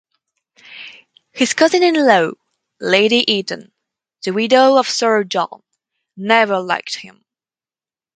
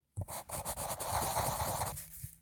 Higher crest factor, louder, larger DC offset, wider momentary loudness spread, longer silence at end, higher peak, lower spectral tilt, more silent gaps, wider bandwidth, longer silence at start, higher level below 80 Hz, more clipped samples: about the same, 18 dB vs 18 dB; first, -15 LUFS vs -37 LUFS; neither; first, 17 LU vs 9 LU; first, 1.1 s vs 0.05 s; first, 0 dBFS vs -20 dBFS; about the same, -3 dB/octave vs -3 dB/octave; neither; second, 9.4 kHz vs 19.5 kHz; first, 0.7 s vs 0.15 s; second, -68 dBFS vs -52 dBFS; neither